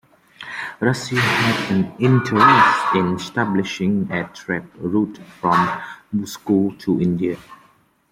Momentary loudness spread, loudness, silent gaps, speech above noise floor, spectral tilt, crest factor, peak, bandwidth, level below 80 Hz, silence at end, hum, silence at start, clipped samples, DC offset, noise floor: 13 LU; -19 LUFS; none; 37 dB; -6 dB/octave; 18 dB; 0 dBFS; 16 kHz; -58 dBFS; 0.55 s; none; 0.4 s; under 0.1%; under 0.1%; -56 dBFS